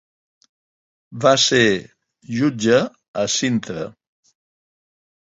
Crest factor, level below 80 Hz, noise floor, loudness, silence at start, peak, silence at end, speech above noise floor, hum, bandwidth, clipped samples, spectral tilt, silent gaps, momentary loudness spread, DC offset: 20 dB; -58 dBFS; under -90 dBFS; -18 LUFS; 1.1 s; -2 dBFS; 1.4 s; over 72 dB; none; 8 kHz; under 0.1%; -3.5 dB/octave; 3.08-3.14 s; 16 LU; under 0.1%